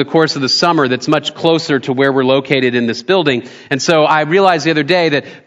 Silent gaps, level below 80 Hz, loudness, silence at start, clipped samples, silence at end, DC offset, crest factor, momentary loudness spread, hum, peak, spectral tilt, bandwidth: none; -60 dBFS; -13 LUFS; 0 s; 0.1%; 0.1 s; under 0.1%; 14 dB; 5 LU; none; 0 dBFS; -4.5 dB/octave; 9.8 kHz